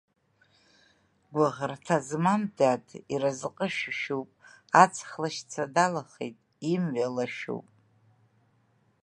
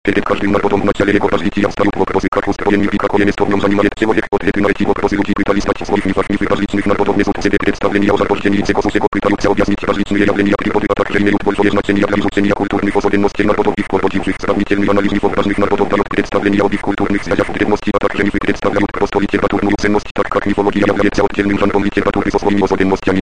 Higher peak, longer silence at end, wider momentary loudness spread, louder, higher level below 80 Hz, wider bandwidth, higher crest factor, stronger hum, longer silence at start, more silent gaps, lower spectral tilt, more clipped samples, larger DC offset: about the same, -2 dBFS vs 0 dBFS; first, 1.4 s vs 0 s; first, 13 LU vs 3 LU; second, -28 LUFS vs -14 LUFS; second, -76 dBFS vs -32 dBFS; first, 11.5 kHz vs 10 kHz; first, 28 dB vs 14 dB; neither; first, 1.3 s vs 0.05 s; second, none vs 2.28-2.32 s, 9.08-9.12 s, 20.11-20.15 s; second, -5 dB/octave vs -6.5 dB/octave; neither; second, under 0.1% vs 4%